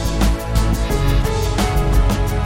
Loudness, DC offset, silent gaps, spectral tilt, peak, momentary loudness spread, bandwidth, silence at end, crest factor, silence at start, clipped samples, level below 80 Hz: -18 LUFS; 1%; none; -5.5 dB/octave; -4 dBFS; 2 LU; 16.5 kHz; 0 s; 12 dB; 0 s; under 0.1%; -18 dBFS